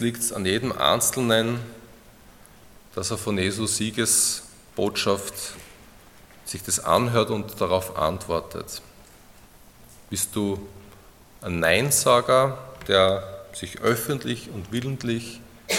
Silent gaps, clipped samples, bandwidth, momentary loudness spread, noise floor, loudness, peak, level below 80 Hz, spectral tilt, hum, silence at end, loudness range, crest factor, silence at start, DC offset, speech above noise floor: none; under 0.1%; 17.5 kHz; 17 LU; -50 dBFS; -23 LUFS; -4 dBFS; -54 dBFS; -3.5 dB/octave; none; 0 s; 7 LU; 22 dB; 0 s; under 0.1%; 26 dB